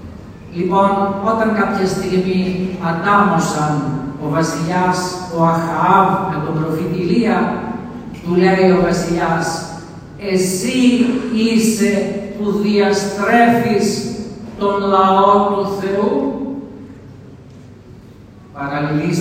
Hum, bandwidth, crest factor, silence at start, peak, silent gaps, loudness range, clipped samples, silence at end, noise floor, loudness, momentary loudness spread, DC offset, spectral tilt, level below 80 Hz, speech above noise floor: none; 16 kHz; 16 dB; 0 s; 0 dBFS; none; 2 LU; under 0.1%; 0 s; -39 dBFS; -16 LUFS; 14 LU; under 0.1%; -5.5 dB/octave; -46 dBFS; 24 dB